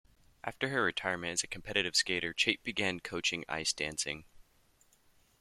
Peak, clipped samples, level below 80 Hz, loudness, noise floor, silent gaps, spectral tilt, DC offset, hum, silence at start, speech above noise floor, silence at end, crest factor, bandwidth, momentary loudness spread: -10 dBFS; under 0.1%; -64 dBFS; -33 LUFS; -68 dBFS; none; -2 dB/octave; under 0.1%; none; 0.45 s; 33 dB; 1.05 s; 26 dB; 15 kHz; 8 LU